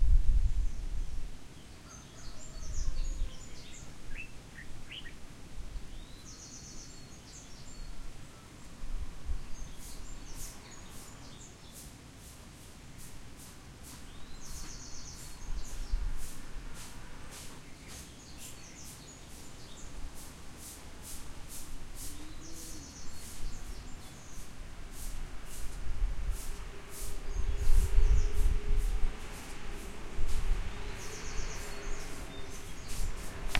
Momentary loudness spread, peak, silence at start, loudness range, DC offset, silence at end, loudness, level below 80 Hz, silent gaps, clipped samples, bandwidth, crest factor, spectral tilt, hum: 13 LU; -12 dBFS; 0 s; 13 LU; under 0.1%; 0 s; -43 LUFS; -36 dBFS; none; under 0.1%; 14.5 kHz; 22 dB; -4 dB/octave; none